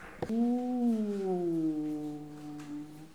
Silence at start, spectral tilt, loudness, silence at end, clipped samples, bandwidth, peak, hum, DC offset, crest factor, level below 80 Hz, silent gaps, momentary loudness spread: 0 s; -8 dB/octave; -33 LUFS; 0 s; under 0.1%; 12.5 kHz; -20 dBFS; none; 0.1%; 14 dB; -66 dBFS; none; 13 LU